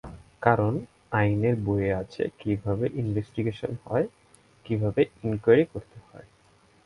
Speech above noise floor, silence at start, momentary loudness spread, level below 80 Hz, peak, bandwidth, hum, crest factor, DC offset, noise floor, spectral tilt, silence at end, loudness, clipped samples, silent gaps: 34 dB; 0.05 s; 10 LU; -50 dBFS; -4 dBFS; 11 kHz; none; 22 dB; under 0.1%; -60 dBFS; -9 dB/octave; 0.65 s; -27 LUFS; under 0.1%; none